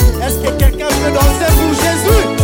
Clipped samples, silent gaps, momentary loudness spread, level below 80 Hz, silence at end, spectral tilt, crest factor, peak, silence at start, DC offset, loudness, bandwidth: under 0.1%; none; 4 LU; -16 dBFS; 0 s; -5 dB/octave; 12 dB; 0 dBFS; 0 s; under 0.1%; -13 LUFS; 17 kHz